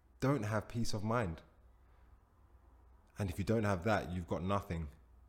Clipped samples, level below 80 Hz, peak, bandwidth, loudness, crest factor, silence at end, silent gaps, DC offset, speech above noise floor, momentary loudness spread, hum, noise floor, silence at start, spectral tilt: under 0.1%; -54 dBFS; -20 dBFS; 16.5 kHz; -37 LUFS; 18 dB; 0.1 s; none; under 0.1%; 29 dB; 10 LU; none; -65 dBFS; 0.2 s; -6.5 dB/octave